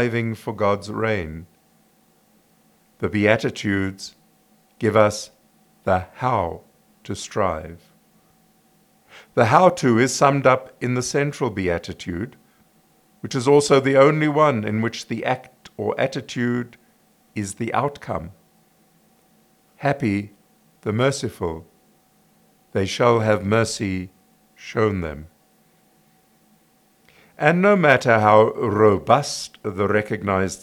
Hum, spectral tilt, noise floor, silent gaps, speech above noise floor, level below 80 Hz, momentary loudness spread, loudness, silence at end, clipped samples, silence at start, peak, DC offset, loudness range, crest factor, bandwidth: none; -5.5 dB/octave; -59 dBFS; none; 39 dB; -56 dBFS; 17 LU; -20 LUFS; 0.05 s; under 0.1%; 0 s; 0 dBFS; under 0.1%; 10 LU; 22 dB; 18.5 kHz